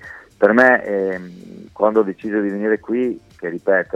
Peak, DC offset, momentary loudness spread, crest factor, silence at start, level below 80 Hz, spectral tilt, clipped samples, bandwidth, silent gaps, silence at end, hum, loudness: 0 dBFS; under 0.1%; 21 LU; 18 dB; 0 s; -58 dBFS; -7.5 dB/octave; under 0.1%; 8.8 kHz; none; 0.1 s; none; -18 LUFS